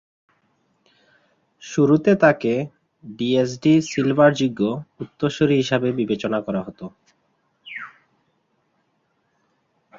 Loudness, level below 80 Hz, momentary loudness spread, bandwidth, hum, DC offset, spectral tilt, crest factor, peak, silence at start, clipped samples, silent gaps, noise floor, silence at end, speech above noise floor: -20 LUFS; -60 dBFS; 20 LU; 7.6 kHz; none; under 0.1%; -6.5 dB/octave; 20 dB; -2 dBFS; 1.6 s; under 0.1%; none; -69 dBFS; 2.1 s; 49 dB